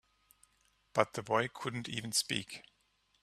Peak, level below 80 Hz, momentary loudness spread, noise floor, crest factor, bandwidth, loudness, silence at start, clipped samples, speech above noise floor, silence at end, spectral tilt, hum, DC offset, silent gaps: -10 dBFS; -72 dBFS; 9 LU; -75 dBFS; 28 dB; 14.5 kHz; -35 LUFS; 0.95 s; under 0.1%; 39 dB; 0.6 s; -3 dB/octave; none; under 0.1%; none